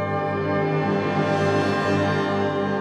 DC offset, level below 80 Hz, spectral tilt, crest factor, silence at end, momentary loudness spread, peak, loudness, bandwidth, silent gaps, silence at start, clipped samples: under 0.1%; -60 dBFS; -7 dB/octave; 12 dB; 0 s; 3 LU; -8 dBFS; -22 LUFS; 11 kHz; none; 0 s; under 0.1%